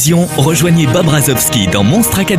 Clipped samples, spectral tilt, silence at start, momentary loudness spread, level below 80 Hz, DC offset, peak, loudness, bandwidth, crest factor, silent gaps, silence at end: under 0.1%; -4.5 dB/octave; 0 s; 1 LU; -34 dBFS; under 0.1%; 0 dBFS; -10 LUFS; 16 kHz; 10 dB; none; 0 s